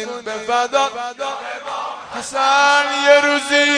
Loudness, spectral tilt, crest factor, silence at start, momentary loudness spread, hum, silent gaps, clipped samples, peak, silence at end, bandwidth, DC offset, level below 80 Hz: -16 LUFS; -0.5 dB/octave; 18 dB; 0 s; 14 LU; none; none; under 0.1%; 0 dBFS; 0 s; 10 kHz; under 0.1%; -64 dBFS